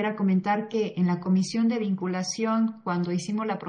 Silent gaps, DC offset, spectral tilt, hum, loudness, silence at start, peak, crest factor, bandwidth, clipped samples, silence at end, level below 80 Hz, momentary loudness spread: none; under 0.1%; -6 dB/octave; none; -26 LUFS; 0 s; -12 dBFS; 12 dB; 10 kHz; under 0.1%; 0 s; -74 dBFS; 5 LU